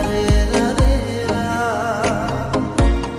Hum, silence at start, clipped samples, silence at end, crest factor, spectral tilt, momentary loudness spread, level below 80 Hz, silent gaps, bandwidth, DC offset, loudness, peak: none; 0 s; under 0.1%; 0 s; 14 dB; -5.5 dB/octave; 4 LU; -22 dBFS; none; 13.5 kHz; under 0.1%; -19 LUFS; -4 dBFS